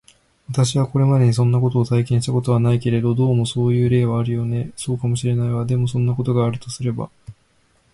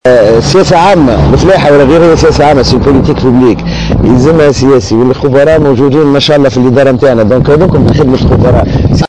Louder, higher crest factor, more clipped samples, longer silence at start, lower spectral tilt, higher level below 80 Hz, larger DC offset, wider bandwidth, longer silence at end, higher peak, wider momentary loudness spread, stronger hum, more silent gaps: second, -19 LUFS vs -6 LUFS; first, 12 dB vs 4 dB; second, under 0.1% vs 0.2%; first, 0.5 s vs 0.05 s; about the same, -7 dB/octave vs -6.5 dB/octave; second, -48 dBFS vs -20 dBFS; second, under 0.1% vs 3%; first, 11.5 kHz vs 9.8 kHz; first, 0.6 s vs 0 s; second, -6 dBFS vs 0 dBFS; first, 9 LU vs 3 LU; neither; neither